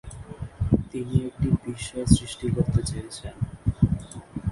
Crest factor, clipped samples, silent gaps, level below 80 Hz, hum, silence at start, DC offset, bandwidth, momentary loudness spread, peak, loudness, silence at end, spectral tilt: 22 dB; under 0.1%; none; -36 dBFS; none; 0.05 s; under 0.1%; 11.5 kHz; 15 LU; -2 dBFS; -26 LUFS; 0 s; -6.5 dB/octave